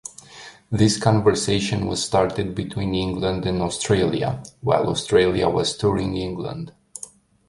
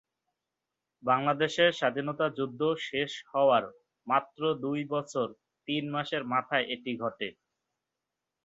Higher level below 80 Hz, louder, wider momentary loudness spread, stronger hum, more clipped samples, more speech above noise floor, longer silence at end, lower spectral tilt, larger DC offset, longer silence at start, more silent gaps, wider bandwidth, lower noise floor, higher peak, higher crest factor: first, -44 dBFS vs -76 dBFS; first, -21 LUFS vs -30 LUFS; first, 19 LU vs 11 LU; neither; neither; second, 23 dB vs 58 dB; second, 0.5 s vs 1.15 s; about the same, -5 dB/octave vs -5 dB/octave; neither; second, 0.05 s vs 1.05 s; neither; first, 11.5 kHz vs 8 kHz; second, -44 dBFS vs -87 dBFS; first, -2 dBFS vs -10 dBFS; about the same, 20 dB vs 20 dB